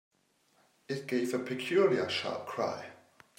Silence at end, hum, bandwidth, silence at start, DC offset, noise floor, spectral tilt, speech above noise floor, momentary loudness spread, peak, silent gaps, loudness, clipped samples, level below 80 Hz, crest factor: 0.45 s; none; 16 kHz; 0.9 s; under 0.1%; -71 dBFS; -5 dB/octave; 39 dB; 13 LU; -14 dBFS; none; -32 LUFS; under 0.1%; -82 dBFS; 20 dB